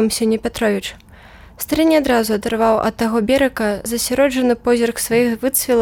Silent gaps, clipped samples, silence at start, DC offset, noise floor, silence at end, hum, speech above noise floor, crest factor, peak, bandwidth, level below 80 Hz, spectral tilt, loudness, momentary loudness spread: none; under 0.1%; 0 s; under 0.1%; -42 dBFS; 0 s; none; 25 dB; 12 dB; -4 dBFS; 19 kHz; -42 dBFS; -4 dB/octave; -17 LUFS; 5 LU